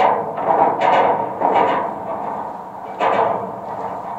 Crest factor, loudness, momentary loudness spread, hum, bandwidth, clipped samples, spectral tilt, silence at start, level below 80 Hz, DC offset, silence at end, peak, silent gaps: 18 dB; -19 LUFS; 12 LU; none; 8.4 kHz; under 0.1%; -6 dB/octave; 0 s; -62 dBFS; under 0.1%; 0 s; 0 dBFS; none